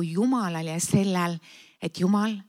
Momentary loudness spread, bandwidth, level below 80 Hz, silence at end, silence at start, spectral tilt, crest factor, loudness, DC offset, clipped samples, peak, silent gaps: 12 LU; 15.5 kHz; -68 dBFS; 0.05 s; 0 s; -5.5 dB/octave; 18 dB; -26 LUFS; under 0.1%; under 0.1%; -8 dBFS; none